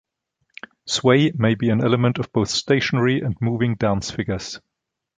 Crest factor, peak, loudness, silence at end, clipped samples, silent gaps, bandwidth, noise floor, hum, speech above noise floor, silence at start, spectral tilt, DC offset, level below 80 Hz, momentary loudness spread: 18 dB; -2 dBFS; -20 LUFS; 0.6 s; under 0.1%; none; 9.4 kHz; -74 dBFS; none; 54 dB; 0.85 s; -5.5 dB/octave; under 0.1%; -48 dBFS; 15 LU